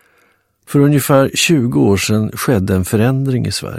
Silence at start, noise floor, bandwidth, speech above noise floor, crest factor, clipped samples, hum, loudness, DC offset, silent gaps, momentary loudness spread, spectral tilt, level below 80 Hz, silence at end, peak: 0.7 s; -57 dBFS; 16 kHz; 44 dB; 14 dB; under 0.1%; none; -14 LUFS; 0.2%; none; 5 LU; -5.5 dB/octave; -44 dBFS; 0 s; 0 dBFS